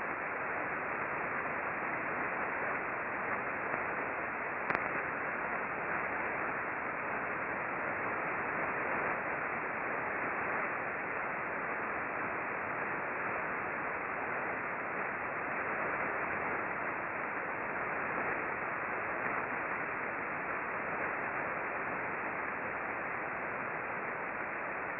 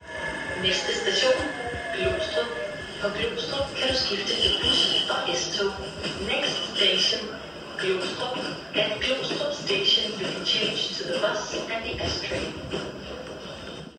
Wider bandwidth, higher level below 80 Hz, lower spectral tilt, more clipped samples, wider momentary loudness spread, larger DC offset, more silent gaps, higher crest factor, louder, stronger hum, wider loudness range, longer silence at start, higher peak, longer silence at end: second, 5 kHz vs 12 kHz; second, -68 dBFS vs -48 dBFS; first, -4.5 dB/octave vs -2.5 dB/octave; neither; second, 2 LU vs 12 LU; neither; neither; first, 26 dB vs 18 dB; second, -36 LUFS vs -25 LUFS; neither; second, 1 LU vs 4 LU; about the same, 0 s vs 0 s; about the same, -12 dBFS vs -10 dBFS; about the same, 0 s vs 0 s